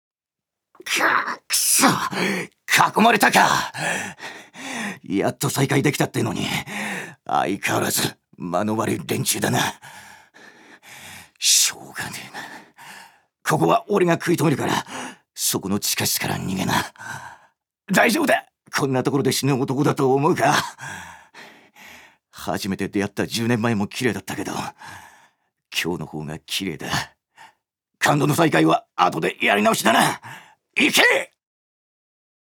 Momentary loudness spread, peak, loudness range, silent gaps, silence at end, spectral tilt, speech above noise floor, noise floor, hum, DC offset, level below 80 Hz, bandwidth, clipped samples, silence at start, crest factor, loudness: 19 LU; 0 dBFS; 7 LU; none; 1.2 s; -3.5 dB/octave; 66 dB; -87 dBFS; none; under 0.1%; -60 dBFS; over 20 kHz; under 0.1%; 0.85 s; 22 dB; -20 LUFS